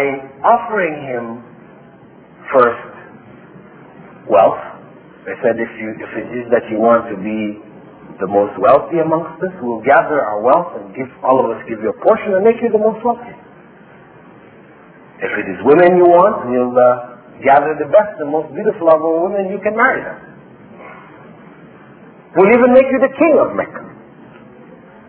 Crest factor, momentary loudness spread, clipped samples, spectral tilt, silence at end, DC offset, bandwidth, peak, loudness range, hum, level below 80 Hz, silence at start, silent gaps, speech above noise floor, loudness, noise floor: 16 dB; 17 LU; under 0.1%; -10.5 dB/octave; 1.15 s; under 0.1%; 4 kHz; 0 dBFS; 7 LU; none; -56 dBFS; 0 s; none; 28 dB; -14 LUFS; -42 dBFS